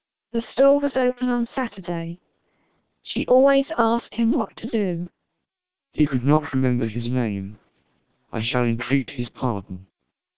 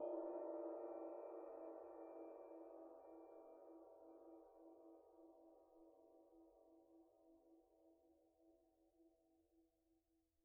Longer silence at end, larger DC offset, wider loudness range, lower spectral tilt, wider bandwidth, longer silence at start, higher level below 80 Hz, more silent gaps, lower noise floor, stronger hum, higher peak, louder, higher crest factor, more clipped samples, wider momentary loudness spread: second, 0 s vs 0.5 s; first, 0.6% vs under 0.1%; second, 3 LU vs 14 LU; first, -11 dB/octave vs -2 dB/octave; first, 4 kHz vs 2.6 kHz; about the same, 0 s vs 0 s; first, -54 dBFS vs under -90 dBFS; neither; about the same, -86 dBFS vs -85 dBFS; neither; first, -2 dBFS vs -38 dBFS; first, -23 LUFS vs -56 LUFS; about the same, 20 dB vs 20 dB; neither; about the same, 15 LU vs 17 LU